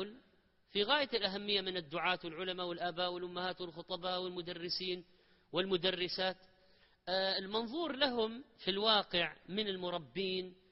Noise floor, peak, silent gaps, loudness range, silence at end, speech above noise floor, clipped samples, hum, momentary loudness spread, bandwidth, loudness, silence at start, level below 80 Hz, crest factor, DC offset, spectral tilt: -71 dBFS; -14 dBFS; none; 4 LU; 0.2 s; 34 dB; under 0.1%; none; 9 LU; 5.8 kHz; -36 LUFS; 0 s; -72 dBFS; 24 dB; under 0.1%; -1.5 dB/octave